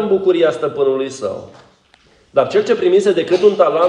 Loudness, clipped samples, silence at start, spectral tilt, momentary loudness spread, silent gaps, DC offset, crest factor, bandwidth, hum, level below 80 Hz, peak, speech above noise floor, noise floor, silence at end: -15 LUFS; under 0.1%; 0 s; -5.5 dB/octave; 10 LU; none; under 0.1%; 14 dB; 10 kHz; none; -60 dBFS; 0 dBFS; 38 dB; -52 dBFS; 0 s